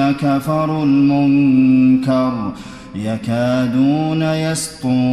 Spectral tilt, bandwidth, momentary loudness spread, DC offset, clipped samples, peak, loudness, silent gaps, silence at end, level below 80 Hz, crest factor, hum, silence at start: -6.5 dB/octave; 13.5 kHz; 12 LU; under 0.1%; under 0.1%; -4 dBFS; -15 LUFS; none; 0 s; -48 dBFS; 10 dB; none; 0 s